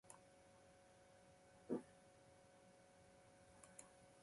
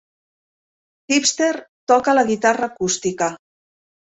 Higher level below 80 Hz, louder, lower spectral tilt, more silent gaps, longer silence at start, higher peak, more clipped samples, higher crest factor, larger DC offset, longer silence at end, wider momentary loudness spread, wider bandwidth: second, -84 dBFS vs -62 dBFS; second, -60 LUFS vs -19 LUFS; first, -5 dB/octave vs -2.5 dB/octave; second, none vs 1.69-1.87 s; second, 0.05 s vs 1.1 s; second, -32 dBFS vs -2 dBFS; neither; first, 28 dB vs 18 dB; neither; second, 0 s vs 0.75 s; first, 18 LU vs 8 LU; first, 11.5 kHz vs 8.4 kHz